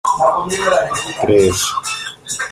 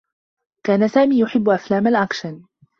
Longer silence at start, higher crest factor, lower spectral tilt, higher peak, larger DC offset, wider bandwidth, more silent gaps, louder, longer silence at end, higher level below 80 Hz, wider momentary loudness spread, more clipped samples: second, 0.05 s vs 0.65 s; about the same, 16 dB vs 16 dB; second, -3 dB/octave vs -6.5 dB/octave; first, 0 dBFS vs -4 dBFS; neither; first, 15.5 kHz vs 7 kHz; neither; about the same, -16 LUFS vs -18 LUFS; second, 0 s vs 0.4 s; first, -46 dBFS vs -60 dBFS; about the same, 10 LU vs 12 LU; neither